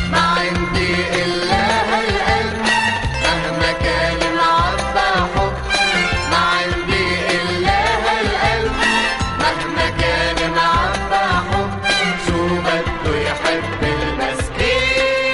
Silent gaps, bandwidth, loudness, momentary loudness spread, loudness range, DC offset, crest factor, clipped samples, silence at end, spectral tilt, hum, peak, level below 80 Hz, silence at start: none; 11.5 kHz; -17 LUFS; 4 LU; 2 LU; under 0.1%; 16 dB; under 0.1%; 0 s; -4 dB/octave; none; -2 dBFS; -30 dBFS; 0 s